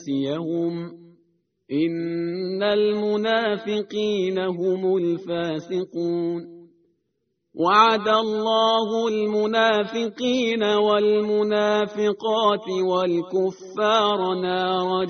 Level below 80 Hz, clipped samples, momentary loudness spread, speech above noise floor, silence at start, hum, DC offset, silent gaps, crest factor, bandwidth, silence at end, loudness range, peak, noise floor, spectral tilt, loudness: -68 dBFS; under 0.1%; 8 LU; 53 dB; 0 s; none; under 0.1%; none; 20 dB; 6.6 kHz; 0 s; 5 LU; -2 dBFS; -75 dBFS; -3 dB/octave; -22 LUFS